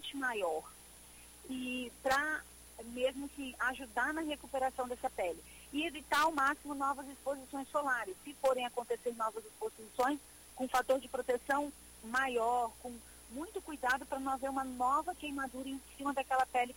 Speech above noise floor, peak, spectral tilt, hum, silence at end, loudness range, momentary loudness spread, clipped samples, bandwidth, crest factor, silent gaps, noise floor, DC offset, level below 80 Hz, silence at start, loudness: 20 dB; -20 dBFS; -2.5 dB/octave; none; 0 s; 3 LU; 13 LU; under 0.1%; 16.5 kHz; 18 dB; none; -56 dBFS; under 0.1%; -64 dBFS; 0 s; -37 LUFS